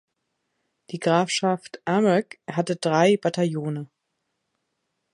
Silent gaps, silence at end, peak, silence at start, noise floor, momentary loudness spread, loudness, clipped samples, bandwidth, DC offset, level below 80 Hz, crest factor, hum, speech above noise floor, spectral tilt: none; 1.3 s; -6 dBFS; 0.9 s; -78 dBFS; 12 LU; -23 LUFS; under 0.1%; 11.5 kHz; under 0.1%; -72 dBFS; 20 dB; none; 55 dB; -5.5 dB/octave